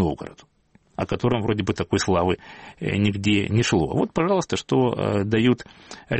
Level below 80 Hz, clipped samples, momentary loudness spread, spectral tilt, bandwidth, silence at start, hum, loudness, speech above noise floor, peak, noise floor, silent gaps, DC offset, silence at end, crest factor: -46 dBFS; under 0.1%; 13 LU; -6 dB/octave; 8.8 kHz; 0 s; none; -23 LUFS; 37 dB; -8 dBFS; -59 dBFS; none; under 0.1%; 0 s; 16 dB